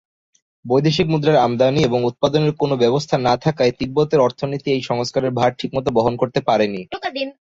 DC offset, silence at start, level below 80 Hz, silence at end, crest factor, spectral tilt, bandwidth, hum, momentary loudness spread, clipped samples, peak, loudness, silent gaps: under 0.1%; 0.65 s; -50 dBFS; 0.15 s; 16 dB; -6.5 dB/octave; 7.8 kHz; none; 6 LU; under 0.1%; -2 dBFS; -18 LUFS; none